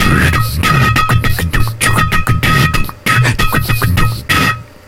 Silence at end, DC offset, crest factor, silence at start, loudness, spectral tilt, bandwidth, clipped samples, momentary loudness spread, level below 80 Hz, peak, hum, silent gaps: 0.25 s; under 0.1%; 12 dB; 0 s; -12 LUFS; -4.5 dB/octave; 17 kHz; under 0.1%; 4 LU; -20 dBFS; 0 dBFS; none; none